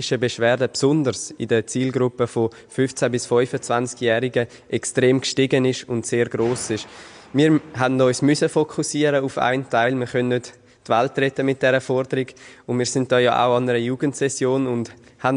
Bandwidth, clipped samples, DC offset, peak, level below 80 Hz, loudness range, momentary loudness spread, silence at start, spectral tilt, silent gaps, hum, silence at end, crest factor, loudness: 10.5 kHz; under 0.1%; under 0.1%; -4 dBFS; -58 dBFS; 2 LU; 8 LU; 0 s; -5 dB/octave; none; none; 0 s; 16 dB; -21 LUFS